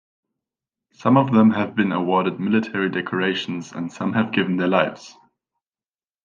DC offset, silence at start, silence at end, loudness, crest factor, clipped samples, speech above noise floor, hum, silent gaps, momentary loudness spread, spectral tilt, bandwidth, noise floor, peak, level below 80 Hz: under 0.1%; 1 s; 1.15 s; -20 LUFS; 20 dB; under 0.1%; over 70 dB; none; none; 10 LU; -7 dB/octave; 7.4 kHz; under -90 dBFS; -2 dBFS; -68 dBFS